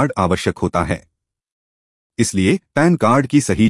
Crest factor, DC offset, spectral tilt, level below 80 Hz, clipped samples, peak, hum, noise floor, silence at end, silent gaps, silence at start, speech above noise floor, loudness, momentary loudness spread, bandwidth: 16 dB; under 0.1%; -5.5 dB/octave; -46 dBFS; under 0.1%; -2 dBFS; none; under -90 dBFS; 0 s; 1.52-2.10 s; 0 s; over 74 dB; -17 LUFS; 8 LU; 12 kHz